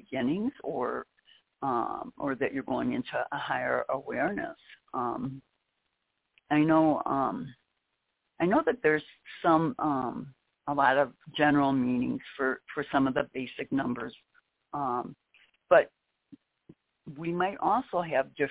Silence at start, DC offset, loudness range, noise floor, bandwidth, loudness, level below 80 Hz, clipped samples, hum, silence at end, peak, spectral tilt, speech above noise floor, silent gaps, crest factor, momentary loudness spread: 0.1 s; under 0.1%; 5 LU; -80 dBFS; 4 kHz; -29 LUFS; -64 dBFS; under 0.1%; none; 0 s; -8 dBFS; -4.5 dB/octave; 52 dB; none; 22 dB; 14 LU